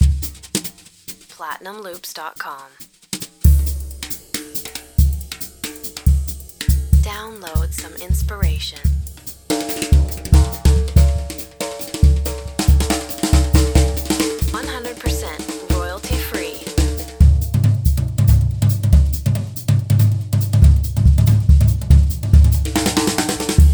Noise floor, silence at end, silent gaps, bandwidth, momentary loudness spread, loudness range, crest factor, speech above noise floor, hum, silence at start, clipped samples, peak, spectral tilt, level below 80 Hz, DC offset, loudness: -38 dBFS; 0 s; none; over 20 kHz; 15 LU; 8 LU; 16 dB; 16 dB; none; 0 s; under 0.1%; 0 dBFS; -5.5 dB/octave; -18 dBFS; under 0.1%; -18 LUFS